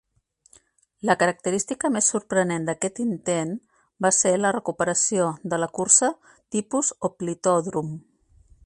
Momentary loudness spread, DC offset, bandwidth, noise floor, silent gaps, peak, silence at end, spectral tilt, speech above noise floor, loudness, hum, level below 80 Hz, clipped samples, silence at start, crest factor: 12 LU; under 0.1%; 11.5 kHz; -64 dBFS; none; -2 dBFS; 0.65 s; -3.5 dB/octave; 41 dB; -23 LUFS; none; -64 dBFS; under 0.1%; 1.05 s; 24 dB